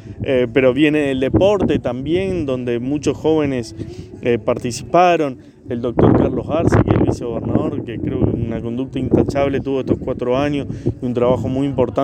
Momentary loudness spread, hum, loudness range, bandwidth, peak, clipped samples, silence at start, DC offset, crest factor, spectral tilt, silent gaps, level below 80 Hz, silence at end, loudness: 9 LU; none; 3 LU; 9.8 kHz; 0 dBFS; under 0.1%; 0 s; under 0.1%; 18 dB; -7 dB/octave; none; -36 dBFS; 0 s; -18 LUFS